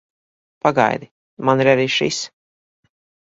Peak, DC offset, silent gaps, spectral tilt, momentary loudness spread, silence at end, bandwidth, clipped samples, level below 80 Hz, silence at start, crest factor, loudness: 0 dBFS; under 0.1%; 1.11-1.37 s; -4.5 dB/octave; 11 LU; 0.95 s; 7.8 kHz; under 0.1%; -62 dBFS; 0.65 s; 20 dB; -18 LUFS